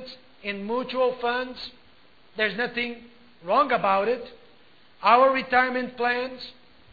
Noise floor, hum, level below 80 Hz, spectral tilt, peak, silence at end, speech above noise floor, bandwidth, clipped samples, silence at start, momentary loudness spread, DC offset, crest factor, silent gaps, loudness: -58 dBFS; none; -64 dBFS; -6 dB/octave; -4 dBFS; 0.4 s; 33 dB; 4.9 kHz; under 0.1%; 0 s; 21 LU; 0.2%; 22 dB; none; -24 LUFS